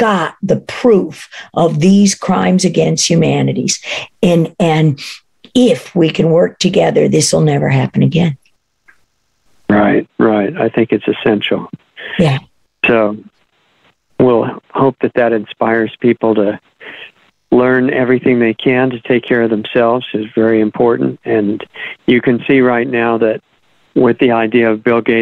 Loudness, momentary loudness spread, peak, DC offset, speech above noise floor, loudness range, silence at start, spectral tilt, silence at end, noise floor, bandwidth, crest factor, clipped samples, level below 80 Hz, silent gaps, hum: -13 LUFS; 9 LU; 0 dBFS; under 0.1%; 48 dB; 3 LU; 0 s; -5.5 dB/octave; 0 s; -60 dBFS; 12.5 kHz; 12 dB; under 0.1%; -50 dBFS; none; none